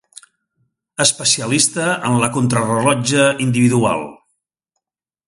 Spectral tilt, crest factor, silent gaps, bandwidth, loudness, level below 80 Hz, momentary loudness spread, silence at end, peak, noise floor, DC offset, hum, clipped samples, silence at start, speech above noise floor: -4 dB/octave; 18 dB; none; 11.5 kHz; -15 LUFS; -54 dBFS; 5 LU; 1.15 s; 0 dBFS; -83 dBFS; under 0.1%; none; under 0.1%; 1 s; 67 dB